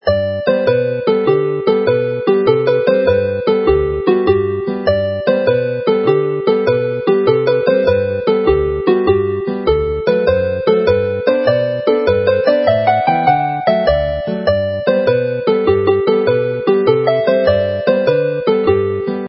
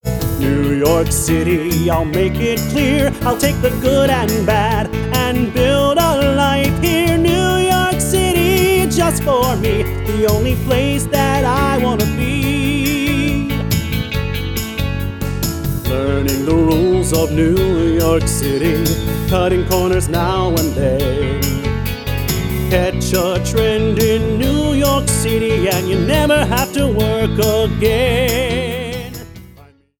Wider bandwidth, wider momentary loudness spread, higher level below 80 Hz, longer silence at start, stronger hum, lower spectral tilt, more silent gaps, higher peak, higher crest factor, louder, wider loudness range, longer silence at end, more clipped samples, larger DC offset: second, 5.8 kHz vs over 20 kHz; second, 3 LU vs 6 LU; second, -34 dBFS vs -26 dBFS; about the same, 0.05 s vs 0.05 s; neither; first, -10.5 dB/octave vs -5 dB/octave; neither; about the same, 0 dBFS vs -2 dBFS; about the same, 14 dB vs 14 dB; about the same, -14 LUFS vs -15 LUFS; about the same, 1 LU vs 3 LU; second, 0 s vs 0.55 s; neither; neither